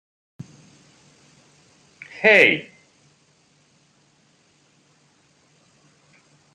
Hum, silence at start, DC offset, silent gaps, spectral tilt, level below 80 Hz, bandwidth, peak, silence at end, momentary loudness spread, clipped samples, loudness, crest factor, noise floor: none; 2.2 s; under 0.1%; none; -4 dB/octave; -74 dBFS; 13.5 kHz; -2 dBFS; 3.9 s; 31 LU; under 0.1%; -15 LUFS; 26 dB; -60 dBFS